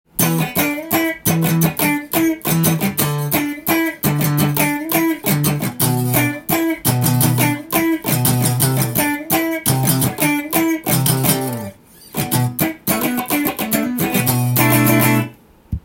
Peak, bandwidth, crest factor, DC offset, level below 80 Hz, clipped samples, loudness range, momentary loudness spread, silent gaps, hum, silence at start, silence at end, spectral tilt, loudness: 0 dBFS; 17 kHz; 18 dB; under 0.1%; -44 dBFS; under 0.1%; 2 LU; 4 LU; none; none; 0.15 s; 0.05 s; -4.5 dB/octave; -17 LUFS